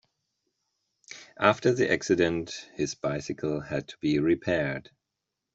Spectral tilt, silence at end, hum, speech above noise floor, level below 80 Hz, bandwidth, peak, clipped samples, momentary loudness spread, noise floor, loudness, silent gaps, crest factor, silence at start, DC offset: -5.5 dB/octave; 0.75 s; none; 58 dB; -60 dBFS; 8 kHz; -4 dBFS; under 0.1%; 14 LU; -85 dBFS; -27 LUFS; none; 24 dB; 1.1 s; under 0.1%